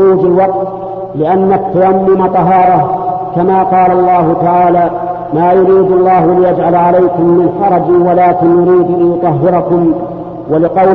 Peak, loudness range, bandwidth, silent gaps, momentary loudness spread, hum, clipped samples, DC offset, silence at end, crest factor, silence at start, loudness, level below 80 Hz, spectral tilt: 0 dBFS; 2 LU; 4.2 kHz; none; 8 LU; none; under 0.1%; under 0.1%; 0 s; 8 dB; 0 s; -9 LUFS; -42 dBFS; -11.5 dB/octave